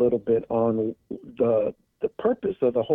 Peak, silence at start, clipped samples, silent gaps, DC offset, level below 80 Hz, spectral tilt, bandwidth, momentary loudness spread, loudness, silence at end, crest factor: -10 dBFS; 0 s; under 0.1%; none; under 0.1%; -60 dBFS; -10.5 dB/octave; 3.8 kHz; 9 LU; -25 LUFS; 0 s; 14 dB